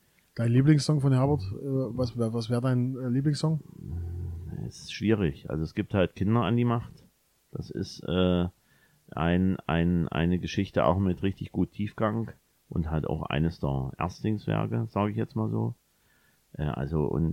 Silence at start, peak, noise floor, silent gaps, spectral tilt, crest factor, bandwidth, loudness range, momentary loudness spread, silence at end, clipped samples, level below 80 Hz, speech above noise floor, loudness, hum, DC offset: 0.35 s; -10 dBFS; -66 dBFS; none; -7.5 dB/octave; 18 dB; 12 kHz; 4 LU; 13 LU; 0 s; under 0.1%; -46 dBFS; 39 dB; -28 LUFS; none; under 0.1%